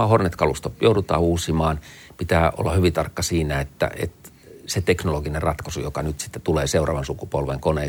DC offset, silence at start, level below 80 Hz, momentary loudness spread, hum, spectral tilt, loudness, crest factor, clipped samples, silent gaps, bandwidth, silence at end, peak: under 0.1%; 0 s; -38 dBFS; 9 LU; none; -5.5 dB/octave; -23 LUFS; 18 dB; under 0.1%; none; 19 kHz; 0 s; -4 dBFS